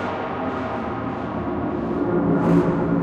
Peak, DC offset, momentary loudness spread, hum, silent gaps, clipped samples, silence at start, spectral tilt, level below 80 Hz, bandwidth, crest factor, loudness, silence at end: -6 dBFS; under 0.1%; 9 LU; none; none; under 0.1%; 0 s; -9 dB/octave; -42 dBFS; 7 kHz; 16 dB; -23 LUFS; 0 s